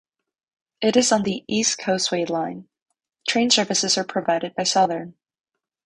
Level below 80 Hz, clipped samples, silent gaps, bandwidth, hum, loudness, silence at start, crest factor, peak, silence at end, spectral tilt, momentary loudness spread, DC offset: -64 dBFS; under 0.1%; 2.82-2.86 s; 11 kHz; none; -21 LUFS; 0.8 s; 18 dB; -4 dBFS; 0.75 s; -2.5 dB/octave; 11 LU; under 0.1%